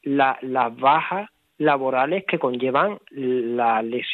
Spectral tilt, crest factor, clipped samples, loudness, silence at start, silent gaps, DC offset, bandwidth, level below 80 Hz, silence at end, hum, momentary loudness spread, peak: -8 dB/octave; 18 dB; under 0.1%; -22 LUFS; 0.05 s; none; under 0.1%; 4.4 kHz; -78 dBFS; 0 s; none; 7 LU; -4 dBFS